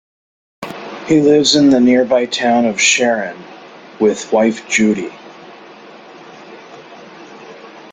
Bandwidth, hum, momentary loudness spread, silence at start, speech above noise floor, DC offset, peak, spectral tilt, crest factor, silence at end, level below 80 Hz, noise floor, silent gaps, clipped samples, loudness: 9.6 kHz; none; 24 LU; 0.6 s; 25 dB; under 0.1%; 0 dBFS; -3.5 dB/octave; 16 dB; 0.05 s; -56 dBFS; -38 dBFS; none; under 0.1%; -13 LUFS